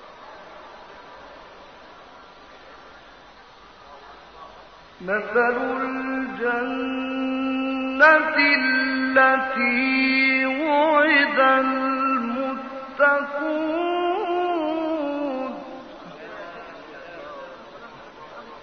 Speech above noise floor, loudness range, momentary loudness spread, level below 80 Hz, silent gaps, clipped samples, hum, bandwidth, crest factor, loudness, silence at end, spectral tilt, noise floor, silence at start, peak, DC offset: 27 dB; 12 LU; 25 LU; -60 dBFS; none; under 0.1%; none; 6.4 kHz; 22 dB; -21 LUFS; 0 s; -5 dB/octave; -47 dBFS; 0 s; -2 dBFS; under 0.1%